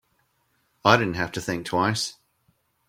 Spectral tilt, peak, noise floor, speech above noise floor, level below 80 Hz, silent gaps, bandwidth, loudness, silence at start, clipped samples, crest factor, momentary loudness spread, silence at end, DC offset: -4.5 dB/octave; 0 dBFS; -69 dBFS; 46 dB; -58 dBFS; none; 16.5 kHz; -24 LUFS; 0.85 s; under 0.1%; 26 dB; 9 LU; 0.75 s; under 0.1%